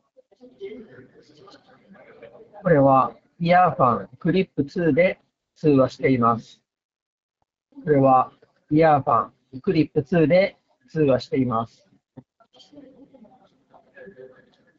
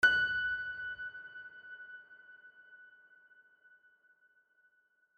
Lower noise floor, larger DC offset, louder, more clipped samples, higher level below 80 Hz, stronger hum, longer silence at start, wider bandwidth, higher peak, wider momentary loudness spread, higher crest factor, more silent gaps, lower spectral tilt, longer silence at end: second, -57 dBFS vs -73 dBFS; neither; first, -20 LUFS vs -35 LUFS; neither; first, -56 dBFS vs -70 dBFS; neither; first, 0.6 s vs 0 s; second, 7.4 kHz vs 9.6 kHz; first, -4 dBFS vs -16 dBFS; second, 16 LU vs 26 LU; second, 18 dB vs 24 dB; first, 6.84-6.89 s, 7.02-7.29 s vs none; first, -6.5 dB/octave vs -1.5 dB/octave; second, 0.5 s vs 2.3 s